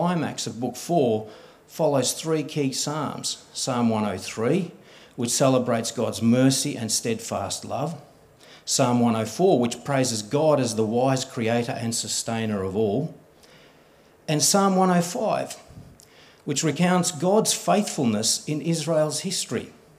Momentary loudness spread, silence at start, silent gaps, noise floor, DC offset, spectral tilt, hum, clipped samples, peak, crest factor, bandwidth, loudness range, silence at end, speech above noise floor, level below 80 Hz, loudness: 9 LU; 0 s; none; -55 dBFS; under 0.1%; -4.5 dB/octave; none; under 0.1%; -6 dBFS; 20 dB; 16 kHz; 3 LU; 0.25 s; 31 dB; -68 dBFS; -23 LUFS